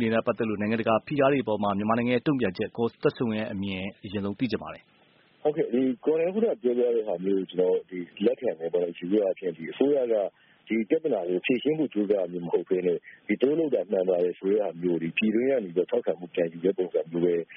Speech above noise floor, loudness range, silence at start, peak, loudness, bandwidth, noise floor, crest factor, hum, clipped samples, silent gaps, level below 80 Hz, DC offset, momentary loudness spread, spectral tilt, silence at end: 34 dB; 3 LU; 0 s; -8 dBFS; -27 LUFS; 5 kHz; -61 dBFS; 18 dB; none; under 0.1%; none; -68 dBFS; under 0.1%; 6 LU; -5.5 dB/octave; 0 s